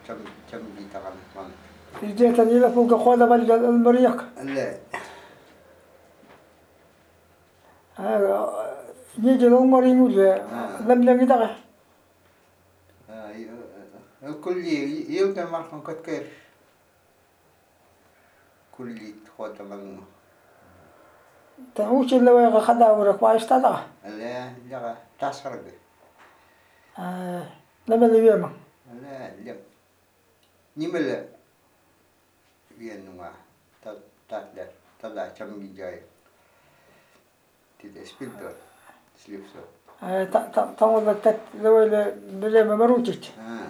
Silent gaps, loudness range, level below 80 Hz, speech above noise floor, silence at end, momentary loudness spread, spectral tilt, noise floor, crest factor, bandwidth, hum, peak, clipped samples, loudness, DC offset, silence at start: none; 23 LU; -70 dBFS; 41 dB; 0 s; 25 LU; -6.5 dB/octave; -63 dBFS; 20 dB; 13 kHz; none; -4 dBFS; under 0.1%; -20 LUFS; under 0.1%; 0.1 s